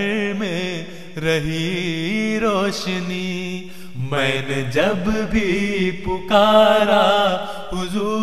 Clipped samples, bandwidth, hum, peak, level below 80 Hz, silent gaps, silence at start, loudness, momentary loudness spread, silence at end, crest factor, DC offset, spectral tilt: under 0.1%; 14.5 kHz; none; -2 dBFS; -40 dBFS; none; 0 s; -19 LUFS; 13 LU; 0 s; 18 dB; 2%; -5 dB/octave